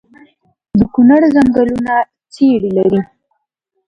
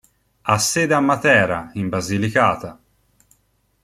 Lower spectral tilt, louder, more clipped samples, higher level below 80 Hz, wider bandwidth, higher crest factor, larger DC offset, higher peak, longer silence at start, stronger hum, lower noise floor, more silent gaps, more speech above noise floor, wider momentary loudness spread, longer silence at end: first, -8.5 dB/octave vs -4 dB/octave; first, -12 LUFS vs -18 LUFS; neither; first, -44 dBFS vs -54 dBFS; second, 8.8 kHz vs 15 kHz; second, 12 dB vs 20 dB; neither; about the same, 0 dBFS vs 0 dBFS; first, 0.75 s vs 0.45 s; neither; first, -70 dBFS vs -64 dBFS; neither; first, 59 dB vs 46 dB; second, 9 LU vs 12 LU; second, 0.85 s vs 1.1 s